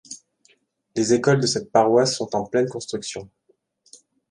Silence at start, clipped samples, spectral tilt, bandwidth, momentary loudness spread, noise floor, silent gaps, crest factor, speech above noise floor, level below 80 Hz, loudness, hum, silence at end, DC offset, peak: 0.1 s; under 0.1%; -4.5 dB/octave; 11.5 kHz; 16 LU; -66 dBFS; none; 20 dB; 45 dB; -62 dBFS; -21 LUFS; none; 1.05 s; under 0.1%; -4 dBFS